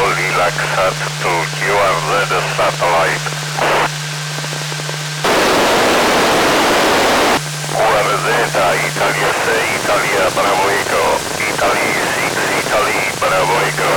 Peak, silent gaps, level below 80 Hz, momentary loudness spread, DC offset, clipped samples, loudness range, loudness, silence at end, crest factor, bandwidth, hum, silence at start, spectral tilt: -6 dBFS; none; -44 dBFS; 6 LU; under 0.1%; under 0.1%; 3 LU; -14 LUFS; 0 s; 8 dB; 19 kHz; none; 0 s; -3 dB/octave